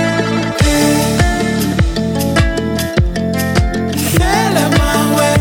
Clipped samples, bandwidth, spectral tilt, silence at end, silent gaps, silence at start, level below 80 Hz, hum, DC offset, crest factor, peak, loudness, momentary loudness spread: under 0.1%; 18 kHz; -5 dB/octave; 0 s; none; 0 s; -22 dBFS; none; under 0.1%; 12 dB; 0 dBFS; -14 LUFS; 4 LU